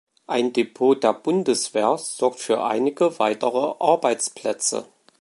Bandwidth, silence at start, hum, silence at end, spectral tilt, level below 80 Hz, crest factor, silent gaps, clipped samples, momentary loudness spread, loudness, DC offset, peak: 11.5 kHz; 0.3 s; none; 0.4 s; -3.5 dB/octave; -76 dBFS; 18 dB; none; under 0.1%; 5 LU; -22 LUFS; under 0.1%; -2 dBFS